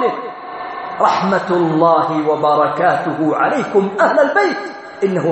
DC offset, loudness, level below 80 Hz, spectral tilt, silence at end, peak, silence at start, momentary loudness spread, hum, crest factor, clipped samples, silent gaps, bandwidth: under 0.1%; -15 LUFS; -60 dBFS; -6.5 dB/octave; 0 s; 0 dBFS; 0 s; 13 LU; none; 14 dB; under 0.1%; none; 8.4 kHz